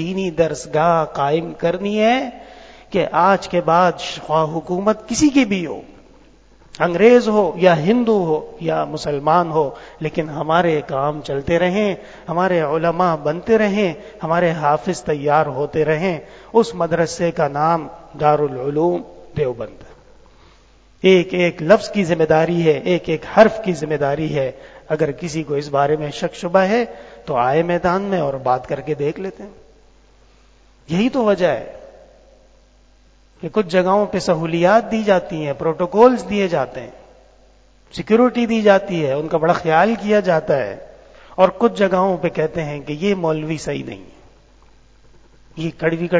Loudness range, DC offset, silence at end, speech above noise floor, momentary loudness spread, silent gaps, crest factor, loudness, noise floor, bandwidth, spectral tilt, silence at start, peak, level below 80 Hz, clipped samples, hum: 6 LU; under 0.1%; 0 s; 34 dB; 11 LU; none; 18 dB; -18 LUFS; -51 dBFS; 8 kHz; -6 dB/octave; 0 s; 0 dBFS; -48 dBFS; under 0.1%; none